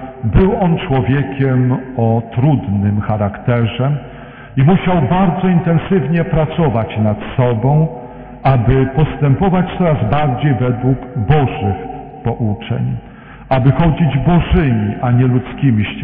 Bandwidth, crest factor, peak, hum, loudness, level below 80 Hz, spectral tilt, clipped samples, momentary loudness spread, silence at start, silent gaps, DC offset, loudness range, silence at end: 3.8 kHz; 14 dB; 0 dBFS; none; -15 LUFS; -28 dBFS; -12 dB/octave; under 0.1%; 7 LU; 0 s; none; under 0.1%; 2 LU; 0 s